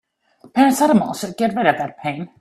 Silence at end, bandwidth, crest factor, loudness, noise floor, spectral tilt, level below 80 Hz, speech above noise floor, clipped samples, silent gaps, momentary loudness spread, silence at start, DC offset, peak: 0.15 s; 15 kHz; 18 dB; -18 LUFS; -51 dBFS; -5 dB/octave; -60 dBFS; 33 dB; under 0.1%; none; 11 LU; 0.45 s; under 0.1%; 0 dBFS